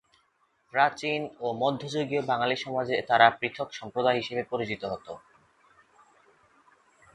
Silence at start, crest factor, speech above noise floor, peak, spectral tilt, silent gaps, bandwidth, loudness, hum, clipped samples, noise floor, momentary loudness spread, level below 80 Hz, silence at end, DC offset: 0.75 s; 26 dB; 42 dB; -2 dBFS; -5 dB/octave; none; 10 kHz; -27 LUFS; none; under 0.1%; -70 dBFS; 13 LU; -68 dBFS; 1.95 s; under 0.1%